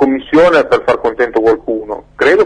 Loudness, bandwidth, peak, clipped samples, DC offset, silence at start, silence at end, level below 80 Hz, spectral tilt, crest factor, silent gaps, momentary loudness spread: -12 LUFS; 10 kHz; 0 dBFS; under 0.1%; under 0.1%; 0 s; 0 s; -42 dBFS; -5.5 dB/octave; 12 dB; none; 11 LU